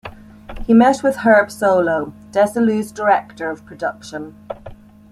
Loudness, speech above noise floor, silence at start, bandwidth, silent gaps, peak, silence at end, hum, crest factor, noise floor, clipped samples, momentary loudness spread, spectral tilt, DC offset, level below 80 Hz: -17 LUFS; 22 dB; 0.05 s; 13.5 kHz; none; -2 dBFS; 0.4 s; none; 16 dB; -39 dBFS; under 0.1%; 20 LU; -6 dB/octave; under 0.1%; -42 dBFS